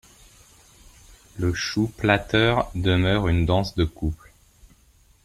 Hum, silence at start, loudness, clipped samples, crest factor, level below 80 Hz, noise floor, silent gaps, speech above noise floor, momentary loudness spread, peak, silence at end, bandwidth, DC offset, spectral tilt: none; 1.35 s; -23 LUFS; under 0.1%; 20 dB; -40 dBFS; -57 dBFS; none; 35 dB; 10 LU; -4 dBFS; 1.1 s; 13.5 kHz; under 0.1%; -6 dB/octave